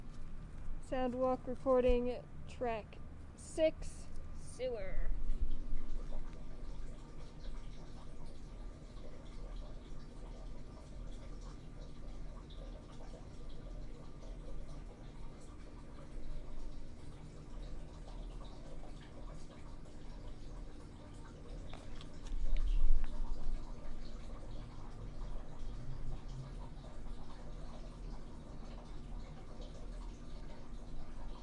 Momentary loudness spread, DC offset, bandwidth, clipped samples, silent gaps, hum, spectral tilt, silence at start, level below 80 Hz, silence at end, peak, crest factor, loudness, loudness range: 15 LU; under 0.1%; 9.6 kHz; under 0.1%; none; none; -6.5 dB/octave; 0 s; -42 dBFS; 0 s; -16 dBFS; 22 dB; -46 LUFS; 15 LU